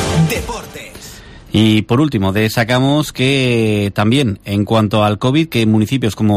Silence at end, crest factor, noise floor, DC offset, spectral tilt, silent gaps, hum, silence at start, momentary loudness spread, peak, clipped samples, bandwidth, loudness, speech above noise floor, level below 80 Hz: 0 s; 12 dB; -35 dBFS; under 0.1%; -6 dB/octave; none; none; 0 s; 13 LU; -2 dBFS; under 0.1%; 15.5 kHz; -14 LUFS; 21 dB; -38 dBFS